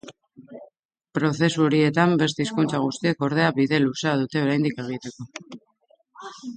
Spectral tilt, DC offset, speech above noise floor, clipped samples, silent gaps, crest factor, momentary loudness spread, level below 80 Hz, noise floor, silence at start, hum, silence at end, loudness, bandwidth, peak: -6 dB/octave; under 0.1%; 41 dB; under 0.1%; 0.79-0.89 s; 18 dB; 18 LU; -64 dBFS; -63 dBFS; 0.05 s; none; 0 s; -22 LUFS; 9.4 kHz; -4 dBFS